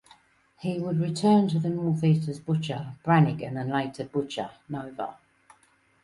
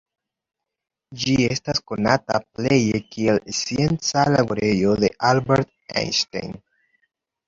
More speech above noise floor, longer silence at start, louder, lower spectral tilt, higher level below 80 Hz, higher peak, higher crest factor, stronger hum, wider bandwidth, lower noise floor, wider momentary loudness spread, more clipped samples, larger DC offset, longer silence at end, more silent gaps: second, 38 dB vs 64 dB; second, 0.6 s vs 1.1 s; second, -27 LUFS vs -21 LUFS; first, -7.5 dB/octave vs -5 dB/octave; second, -64 dBFS vs -50 dBFS; second, -10 dBFS vs -2 dBFS; about the same, 18 dB vs 20 dB; neither; first, 11.5 kHz vs 7.8 kHz; second, -64 dBFS vs -85 dBFS; first, 14 LU vs 8 LU; neither; neither; about the same, 0.9 s vs 0.9 s; neither